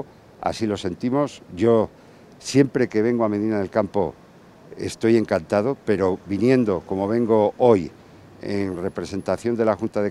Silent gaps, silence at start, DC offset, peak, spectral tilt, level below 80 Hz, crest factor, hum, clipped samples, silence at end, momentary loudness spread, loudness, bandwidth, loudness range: none; 0 s; under 0.1%; -4 dBFS; -6.5 dB/octave; -58 dBFS; 18 dB; none; under 0.1%; 0 s; 10 LU; -22 LUFS; 12.5 kHz; 2 LU